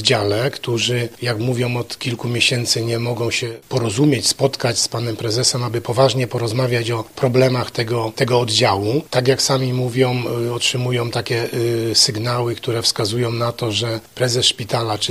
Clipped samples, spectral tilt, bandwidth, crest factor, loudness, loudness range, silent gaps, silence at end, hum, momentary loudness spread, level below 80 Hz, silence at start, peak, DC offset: under 0.1%; -4 dB/octave; 15.5 kHz; 18 dB; -18 LUFS; 1 LU; none; 0 s; none; 6 LU; -54 dBFS; 0 s; 0 dBFS; 0.2%